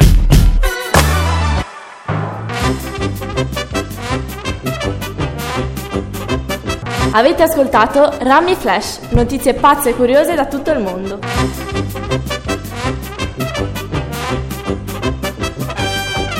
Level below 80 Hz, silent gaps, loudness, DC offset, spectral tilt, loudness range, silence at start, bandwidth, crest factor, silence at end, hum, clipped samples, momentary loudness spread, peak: -22 dBFS; none; -16 LUFS; under 0.1%; -5 dB/octave; 8 LU; 0 s; 17 kHz; 16 dB; 0 s; none; under 0.1%; 10 LU; 0 dBFS